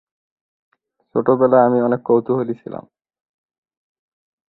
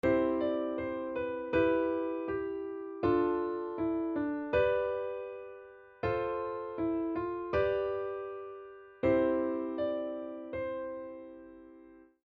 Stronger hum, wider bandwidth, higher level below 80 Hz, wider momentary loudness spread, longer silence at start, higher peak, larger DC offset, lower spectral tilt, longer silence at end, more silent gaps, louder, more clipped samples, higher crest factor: neither; second, 4.1 kHz vs 5.2 kHz; second, -64 dBFS vs -58 dBFS; about the same, 17 LU vs 17 LU; first, 1.15 s vs 0.05 s; first, -2 dBFS vs -16 dBFS; neither; first, -12.5 dB/octave vs -5.5 dB/octave; first, 1.7 s vs 0.2 s; neither; first, -17 LUFS vs -33 LUFS; neither; about the same, 18 dB vs 18 dB